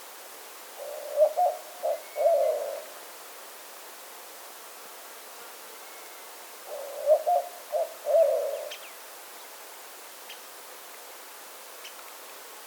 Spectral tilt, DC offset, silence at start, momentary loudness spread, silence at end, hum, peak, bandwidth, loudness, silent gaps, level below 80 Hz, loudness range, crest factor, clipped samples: 0.5 dB/octave; under 0.1%; 0 s; 19 LU; 0 s; none; -12 dBFS; over 20 kHz; -28 LUFS; none; under -90 dBFS; 14 LU; 20 dB; under 0.1%